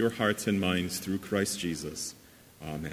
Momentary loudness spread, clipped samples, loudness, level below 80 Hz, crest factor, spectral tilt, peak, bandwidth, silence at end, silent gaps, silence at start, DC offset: 11 LU; under 0.1%; -31 LUFS; -54 dBFS; 20 dB; -4 dB/octave; -12 dBFS; 16 kHz; 0 s; none; 0 s; under 0.1%